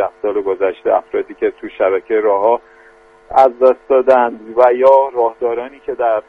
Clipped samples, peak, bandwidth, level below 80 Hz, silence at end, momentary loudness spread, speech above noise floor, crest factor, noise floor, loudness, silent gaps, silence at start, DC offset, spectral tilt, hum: under 0.1%; 0 dBFS; 5.2 kHz; -54 dBFS; 0.1 s; 10 LU; 31 dB; 14 dB; -45 dBFS; -14 LUFS; none; 0 s; under 0.1%; -6.5 dB/octave; none